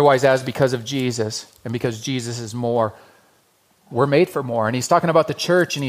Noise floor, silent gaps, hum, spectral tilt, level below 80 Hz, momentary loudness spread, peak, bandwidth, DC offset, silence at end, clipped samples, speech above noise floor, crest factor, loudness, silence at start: -60 dBFS; none; none; -5 dB/octave; -60 dBFS; 9 LU; -2 dBFS; 15.5 kHz; under 0.1%; 0 s; under 0.1%; 40 dB; 18 dB; -20 LUFS; 0 s